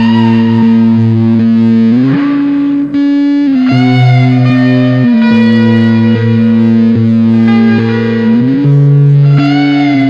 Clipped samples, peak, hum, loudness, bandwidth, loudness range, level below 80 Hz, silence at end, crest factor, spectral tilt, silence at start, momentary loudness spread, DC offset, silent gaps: under 0.1%; 0 dBFS; none; -8 LUFS; 6.6 kHz; 1 LU; -46 dBFS; 0 s; 6 dB; -9 dB/octave; 0 s; 3 LU; under 0.1%; none